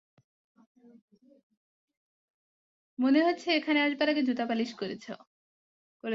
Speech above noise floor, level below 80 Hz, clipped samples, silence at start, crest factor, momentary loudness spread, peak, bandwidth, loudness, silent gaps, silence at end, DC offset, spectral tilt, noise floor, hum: over 61 dB; -80 dBFS; under 0.1%; 3 s; 20 dB; 18 LU; -12 dBFS; 7.8 kHz; -28 LUFS; 5.27-6.00 s; 0 s; under 0.1%; -4.5 dB/octave; under -90 dBFS; none